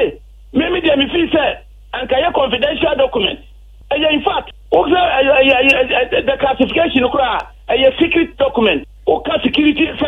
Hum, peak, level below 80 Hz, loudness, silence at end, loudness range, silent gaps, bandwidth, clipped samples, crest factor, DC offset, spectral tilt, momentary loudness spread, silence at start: none; 0 dBFS; -38 dBFS; -14 LUFS; 0 s; 3 LU; none; 8.6 kHz; under 0.1%; 14 dB; under 0.1%; -6 dB/octave; 9 LU; 0 s